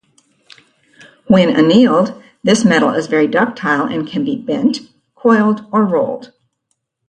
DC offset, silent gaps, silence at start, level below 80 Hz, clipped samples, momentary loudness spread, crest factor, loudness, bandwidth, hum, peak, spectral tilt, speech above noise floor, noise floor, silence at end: under 0.1%; none; 1.3 s; -56 dBFS; under 0.1%; 9 LU; 14 dB; -14 LUFS; 9.8 kHz; none; 0 dBFS; -5.5 dB/octave; 56 dB; -69 dBFS; 0.85 s